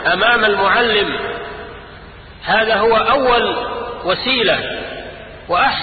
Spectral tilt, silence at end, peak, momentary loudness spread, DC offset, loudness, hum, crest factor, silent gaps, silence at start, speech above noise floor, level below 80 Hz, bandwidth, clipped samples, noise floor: -9 dB/octave; 0 s; -2 dBFS; 17 LU; under 0.1%; -15 LUFS; none; 14 dB; none; 0 s; 22 dB; -42 dBFS; 4.8 kHz; under 0.1%; -37 dBFS